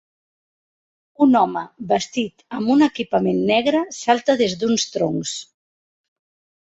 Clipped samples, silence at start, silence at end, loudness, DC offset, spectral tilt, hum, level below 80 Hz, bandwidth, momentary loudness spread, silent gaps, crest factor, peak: under 0.1%; 1.2 s; 1.2 s; -19 LUFS; under 0.1%; -4.5 dB/octave; none; -60 dBFS; 8.2 kHz; 9 LU; none; 20 dB; -2 dBFS